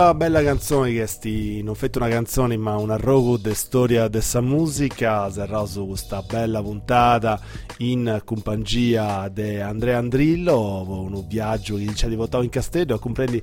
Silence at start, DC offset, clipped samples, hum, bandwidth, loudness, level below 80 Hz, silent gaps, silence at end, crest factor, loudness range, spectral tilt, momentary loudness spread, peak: 0 s; under 0.1%; under 0.1%; none; 16.5 kHz; -22 LUFS; -36 dBFS; none; 0 s; 18 dB; 2 LU; -6 dB/octave; 9 LU; -4 dBFS